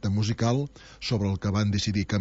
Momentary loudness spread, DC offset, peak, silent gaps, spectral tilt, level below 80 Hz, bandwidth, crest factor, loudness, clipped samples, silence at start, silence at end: 6 LU; under 0.1%; -14 dBFS; none; -6 dB/octave; -50 dBFS; 8 kHz; 12 dB; -27 LUFS; under 0.1%; 0 s; 0 s